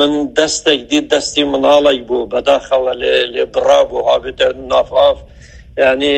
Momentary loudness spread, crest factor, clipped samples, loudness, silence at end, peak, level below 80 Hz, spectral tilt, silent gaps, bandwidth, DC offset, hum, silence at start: 5 LU; 14 dB; under 0.1%; -13 LUFS; 0 s; 0 dBFS; -42 dBFS; -2.5 dB/octave; none; 9.2 kHz; under 0.1%; none; 0 s